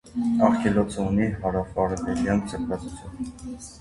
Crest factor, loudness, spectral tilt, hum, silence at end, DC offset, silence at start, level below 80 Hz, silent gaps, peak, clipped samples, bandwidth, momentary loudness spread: 20 dB; -25 LUFS; -7 dB/octave; none; 0 s; under 0.1%; 0.05 s; -42 dBFS; none; -4 dBFS; under 0.1%; 11.5 kHz; 15 LU